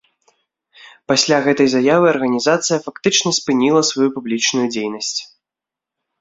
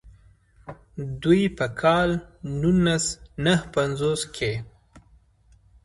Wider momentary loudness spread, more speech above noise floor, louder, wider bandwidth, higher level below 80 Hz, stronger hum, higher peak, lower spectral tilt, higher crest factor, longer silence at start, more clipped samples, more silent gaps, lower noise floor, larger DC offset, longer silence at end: second, 8 LU vs 14 LU; first, 70 dB vs 35 dB; first, -16 LUFS vs -24 LUFS; second, 8 kHz vs 11.5 kHz; second, -62 dBFS vs -46 dBFS; neither; first, -2 dBFS vs -6 dBFS; second, -3 dB/octave vs -5 dB/octave; about the same, 16 dB vs 18 dB; first, 0.85 s vs 0.05 s; neither; neither; first, -86 dBFS vs -58 dBFS; neither; about the same, 0.95 s vs 0.85 s